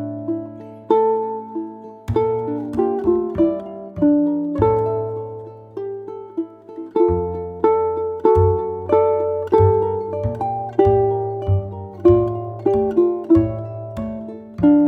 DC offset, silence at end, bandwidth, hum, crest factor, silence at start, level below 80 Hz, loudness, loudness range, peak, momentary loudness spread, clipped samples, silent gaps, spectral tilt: under 0.1%; 0 s; 4.9 kHz; none; 16 dB; 0 s; -40 dBFS; -19 LUFS; 4 LU; -2 dBFS; 15 LU; under 0.1%; none; -11 dB/octave